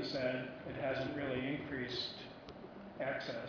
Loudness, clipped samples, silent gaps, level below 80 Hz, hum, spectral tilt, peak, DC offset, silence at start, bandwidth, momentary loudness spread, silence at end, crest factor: -40 LUFS; under 0.1%; none; -66 dBFS; none; -3.5 dB/octave; -24 dBFS; under 0.1%; 0 s; 5.4 kHz; 13 LU; 0 s; 16 dB